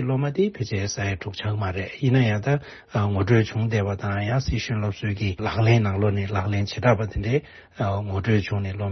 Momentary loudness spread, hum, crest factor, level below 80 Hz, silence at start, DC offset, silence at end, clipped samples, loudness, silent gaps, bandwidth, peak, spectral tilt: 7 LU; none; 18 dB; -44 dBFS; 0 s; under 0.1%; 0 s; under 0.1%; -24 LUFS; none; 6.4 kHz; -6 dBFS; -6.5 dB/octave